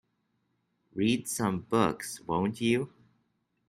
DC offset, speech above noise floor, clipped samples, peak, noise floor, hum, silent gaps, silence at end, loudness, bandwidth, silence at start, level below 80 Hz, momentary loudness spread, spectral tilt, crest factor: under 0.1%; 47 dB; under 0.1%; -10 dBFS; -76 dBFS; none; none; 0.8 s; -30 LUFS; 15.5 kHz; 0.95 s; -64 dBFS; 9 LU; -5 dB/octave; 22 dB